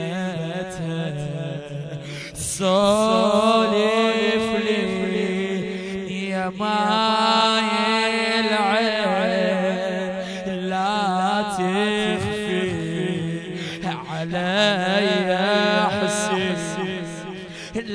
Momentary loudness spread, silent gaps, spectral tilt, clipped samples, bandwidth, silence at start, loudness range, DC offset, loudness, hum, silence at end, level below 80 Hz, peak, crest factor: 11 LU; none; -4.5 dB/octave; under 0.1%; 11 kHz; 0 s; 4 LU; under 0.1%; -21 LUFS; none; 0 s; -54 dBFS; -4 dBFS; 16 dB